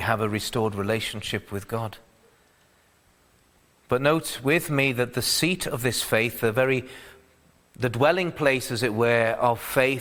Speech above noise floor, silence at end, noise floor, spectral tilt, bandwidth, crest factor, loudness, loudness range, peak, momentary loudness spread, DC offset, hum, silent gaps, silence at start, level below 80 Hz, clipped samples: 37 dB; 0 s; -61 dBFS; -4.5 dB/octave; over 20 kHz; 22 dB; -24 LUFS; 7 LU; -4 dBFS; 9 LU; under 0.1%; none; none; 0 s; -54 dBFS; under 0.1%